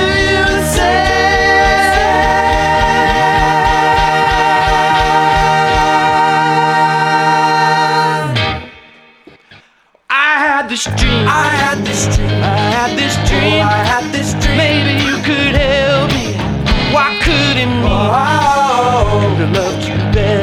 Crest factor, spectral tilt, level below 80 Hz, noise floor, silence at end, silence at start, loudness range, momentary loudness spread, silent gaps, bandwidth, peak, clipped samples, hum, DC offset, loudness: 12 dB; -4.5 dB/octave; -24 dBFS; -50 dBFS; 0 s; 0 s; 4 LU; 4 LU; none; 15.5 kHz; 0 dBFS; under 0.1%; none; under 0.1%; -12 LUFS